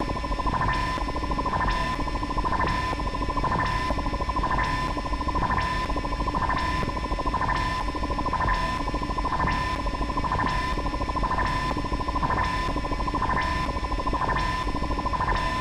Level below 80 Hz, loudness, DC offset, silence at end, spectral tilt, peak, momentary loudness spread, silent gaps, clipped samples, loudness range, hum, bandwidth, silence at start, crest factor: -32 dBFS; -27 LUFS; under 0.1%; 0 s; -5.5 dB/octave; -12 dBFS; 3 LU; none; under 0.1%; 0 LU; none; 12.5 kHz; 0 s; 14 dB